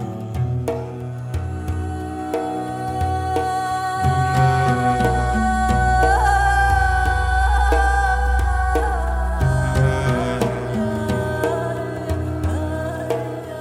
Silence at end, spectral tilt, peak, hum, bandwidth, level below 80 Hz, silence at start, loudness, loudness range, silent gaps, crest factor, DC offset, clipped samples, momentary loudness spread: 0 s; -6.5 dB/octave; -4 dBFS; none; 14.5 kHz; -24 dBFS; 0 s; -20 LUFS; 6 LU; none; 14 dB; under 0.1%; under 0.1%; 10 LU